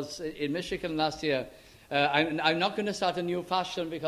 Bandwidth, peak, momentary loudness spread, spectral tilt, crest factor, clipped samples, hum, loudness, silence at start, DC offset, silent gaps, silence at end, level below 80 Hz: 15.5 kHz; -8 dBFS; 8 LU; -4.5 dB/octave; 22 dB; under 0.1%; none; -29 LUFS; 0 s; under 0.1%; none; 0 s; -60 dBFS